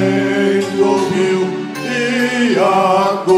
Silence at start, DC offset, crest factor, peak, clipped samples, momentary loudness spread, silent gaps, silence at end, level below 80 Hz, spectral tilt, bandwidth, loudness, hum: 0 s; under 0.1%; 12 dB; -2 dBFS; under 0.1%; 6 LU; none; 0 s; -60 dBFS; -5.5 dB/octave; 15 kHz; -15 LUFS; none